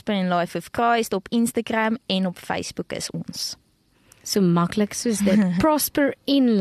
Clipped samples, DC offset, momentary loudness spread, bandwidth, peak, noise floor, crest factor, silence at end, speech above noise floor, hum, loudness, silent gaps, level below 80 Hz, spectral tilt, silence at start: under 0.1%; under 0.1%; 10 LU; 13.5 kHz; -8 dBFS; -60 dBFS; 14 dB; 0 s; 39 dB; none; -22 LUFS; none; -54 dBFS; -5 dB/octave; 0.05 s